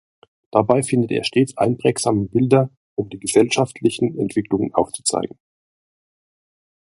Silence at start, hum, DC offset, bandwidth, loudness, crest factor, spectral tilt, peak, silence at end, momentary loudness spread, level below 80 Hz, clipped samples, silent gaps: 0.55 s; none; under 0.1%; 11.5 kHz; -19 LUFS; 20 dB; -5 dB/octave; 0 dBFS; 1.55 s; 9 LU; -54 dBFS; under 0.1%; 2.77-2.96 s